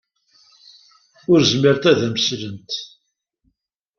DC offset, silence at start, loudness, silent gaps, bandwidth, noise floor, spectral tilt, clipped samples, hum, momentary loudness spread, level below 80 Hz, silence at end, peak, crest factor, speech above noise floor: under 0.1%; 1.3 s; -18 LUFS; none; 7.2 kHz; -72 dBFS; -5 dB/octave; under 0.1%; none; 15 LU; -58 dBFS; 1.1 s; -2 dBFS; 20 dB; 55 dB